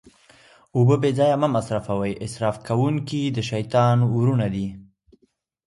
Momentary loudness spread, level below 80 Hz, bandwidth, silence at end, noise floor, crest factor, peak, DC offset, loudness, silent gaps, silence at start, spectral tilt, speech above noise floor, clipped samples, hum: 8 LU; -52 dBFS; 11.5 kHz; 0.85 s; -66 dBFS; 16 dB; -6 dBFS; under 0.1%; -22 LUFS; none; 0.75 s; -7.5 dB/octave; 46 dB; under 0.1%; none